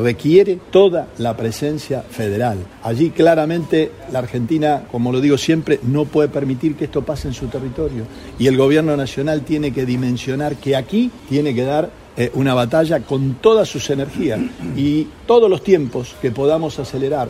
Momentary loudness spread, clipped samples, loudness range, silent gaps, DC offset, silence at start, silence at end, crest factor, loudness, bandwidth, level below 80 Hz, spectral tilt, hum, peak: 10 LU; under 0.1%; 2 LU; none; under 0.1%; 0 s; 0 s; 16 dB; -17 LUFS; 15 kHz; -42 dBFS; -6.5 dB/octave; none; 0 dBFS